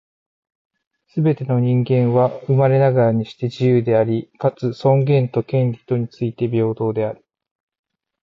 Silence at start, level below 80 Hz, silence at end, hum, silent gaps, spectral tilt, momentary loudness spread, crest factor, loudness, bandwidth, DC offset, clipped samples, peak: 1.15 s; -58 dBFS; 1.1 s; none; none; -10 dB/octave; 8 LU; 14 dB; -18 LUFS; 6 kHz; under 0.1%; under 0.1%; -6 dBFS